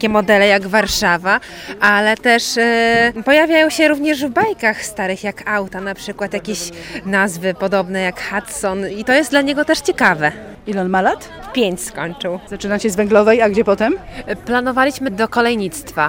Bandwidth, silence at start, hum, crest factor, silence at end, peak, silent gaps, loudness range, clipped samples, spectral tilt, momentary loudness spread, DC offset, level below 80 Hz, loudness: 17 kHz; 0 s; none; 16 dB; 0 s; 0 dBFS; none; 6 LU; under 0.1%; -4 dB/octave; 12 LU; under 0.1%; -44 dBFS; -16 LUFS